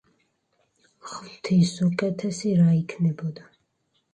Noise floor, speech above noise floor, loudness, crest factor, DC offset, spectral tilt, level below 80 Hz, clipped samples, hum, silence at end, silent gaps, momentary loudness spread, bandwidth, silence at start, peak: -72 dBFS; 49 dB; -24 LUFS; 18 dB; under 0.1%; -7 dB/octave; -66 dBFS; under 0.1%; none; 0.7 s; none; 19 LU; 9.6 kHz; 1.05 s; -8 dBFS